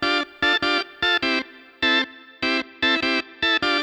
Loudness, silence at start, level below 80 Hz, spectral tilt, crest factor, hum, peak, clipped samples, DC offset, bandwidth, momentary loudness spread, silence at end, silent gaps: -21 LUFS; 0 s; -54 dBFS; -2.5 dB/octave; 16 dB; none; -8 dBFS; under 0.1%; under 0.1%; 12.5 kHz; 6 LU; 0 s; none